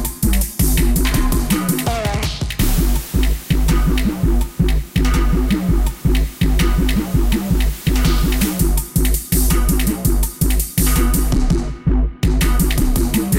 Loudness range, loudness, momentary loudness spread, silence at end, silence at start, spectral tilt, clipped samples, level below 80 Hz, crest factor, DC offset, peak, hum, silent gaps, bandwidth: 1 LU; -18 LUFS; 3 LU; 0 s; 0 s; -5 dB/octave; under 0.1%; -18 dBFS; 12 dB; 0.4%; -2 dBFS; none; none; 17 kHz